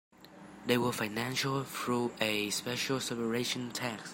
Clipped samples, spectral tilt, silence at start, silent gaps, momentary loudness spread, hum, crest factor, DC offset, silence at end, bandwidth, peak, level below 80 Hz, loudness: under 0.1%; -3.5 dB/octave; 0.2 s; none; 6 LU; none; 20 dB; under 0.1%; 0 s; 16.5 kHz; -14 dBFS; -70 dBFS; -33 LUFS